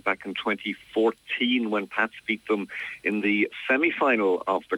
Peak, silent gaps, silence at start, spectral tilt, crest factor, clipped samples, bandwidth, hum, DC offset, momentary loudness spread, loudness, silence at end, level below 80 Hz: -8 dBFS; none; 0.05 s; -5.5 dB/octave; 18 dB; under 0.1%; 12 kHz; none; under 0.1%; 7 LU; -25 LUFS; 0 s; -70 dBFS